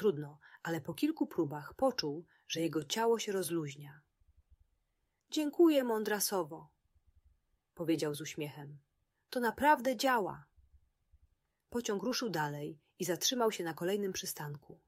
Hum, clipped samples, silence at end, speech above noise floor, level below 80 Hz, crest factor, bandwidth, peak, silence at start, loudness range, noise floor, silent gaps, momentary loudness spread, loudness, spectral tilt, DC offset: none; under 0.1%; 0.15 s; 47 dB; -72 dBFS; 20 dB; 16 kHz; -16 dBFS; 0 s; 4 LU; -82 dBFS; none; 16 LU; -35 LUFS; -4 dB/octave; under 0.1%